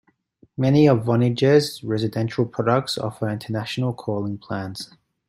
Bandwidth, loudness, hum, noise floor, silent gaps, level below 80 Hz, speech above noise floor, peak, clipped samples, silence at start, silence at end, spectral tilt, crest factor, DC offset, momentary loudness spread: 15.5 kHz; -22 LUFS; none; -58 dBFS; none; -60 dBFS; 37 dB; -4 dBFS; under 0.1%; 0.6 s; 0.45 s; -7 dB/octave; 18 dB; under 0.1%; 13 LU